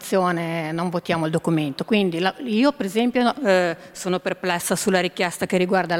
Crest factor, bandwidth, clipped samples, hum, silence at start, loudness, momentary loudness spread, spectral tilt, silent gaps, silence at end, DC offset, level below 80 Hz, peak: 18 dB; 16.5 kHz; under 0.1%; none; 0 s; -22 LUFS; 5 LU; -5 dB/octave; none; 0 s; under 0.1%; -62 dBFS; -4 dBFS